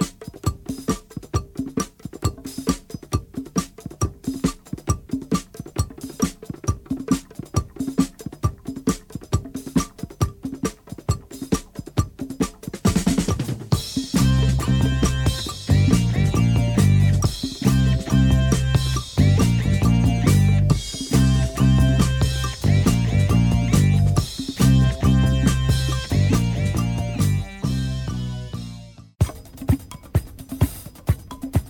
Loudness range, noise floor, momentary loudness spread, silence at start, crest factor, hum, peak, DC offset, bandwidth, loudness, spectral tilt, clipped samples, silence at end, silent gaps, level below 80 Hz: 9 LU; -40 dBFS; 11 LU; 0 s; 16 dB; none; -4 dBFS; under 0.1%; 18.5 kHz; -22 LUFS; -6 dB/octave; under 0.1%; 0 s; none; -30 dBFS